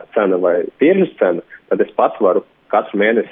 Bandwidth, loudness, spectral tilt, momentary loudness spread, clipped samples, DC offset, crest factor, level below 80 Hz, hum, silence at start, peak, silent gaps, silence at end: 3.8 kHz; -16 LUFS; -10.5 dB/octave; 5 LU; under 0.1%; under 0.1%; 14 dB; -66 dBFS; none; 0 s; -2 dBFS; none; 0 s